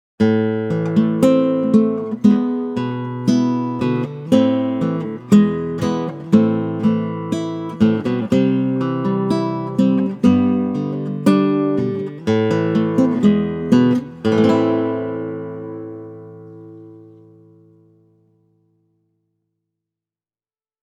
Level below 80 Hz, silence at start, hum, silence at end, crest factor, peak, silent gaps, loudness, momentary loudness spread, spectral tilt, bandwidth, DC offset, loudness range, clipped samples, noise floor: -56 dBFS; 0.2 s; none; 3.85 s; 18 dB; 0 dBFS; none; -18 LUFS; 10 LU; -8 dB/octave; 10 kHz; under 0.1%; 5 LU; under 0.1%; under -90 dBFS